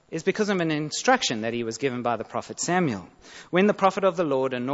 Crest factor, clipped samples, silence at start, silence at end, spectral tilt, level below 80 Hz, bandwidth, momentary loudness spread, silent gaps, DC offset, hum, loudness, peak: 20 dB; under 0.1%; 0.1 s; 0 s; -4.5 dB/octave; -64 dBFS; 8 kHz; 8 LU; none; under 0.1%; none; -25 LUFS; -6 dBFS